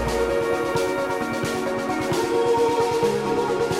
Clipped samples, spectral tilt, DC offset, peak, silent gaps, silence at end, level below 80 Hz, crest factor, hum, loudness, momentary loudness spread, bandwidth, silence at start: under 0.1%; -5 dB/octave; under 0.1%; -10 dBFS; none; 0 s; -44 dBFS; 12 dB; none; -23 LUFS; 5 LU; 16 kHz; 0 s